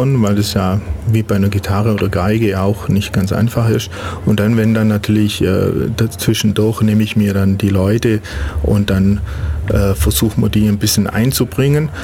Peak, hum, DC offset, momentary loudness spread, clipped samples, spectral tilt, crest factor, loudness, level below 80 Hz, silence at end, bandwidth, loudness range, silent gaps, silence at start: -2 dBFS; none; under 0.1%; 4 LU; under 0.1%; -6 dB/octave; 12 dB; -15 LUFS; -28 dBFS; 0 s; 17 kHz; 1 LU; none; 0 s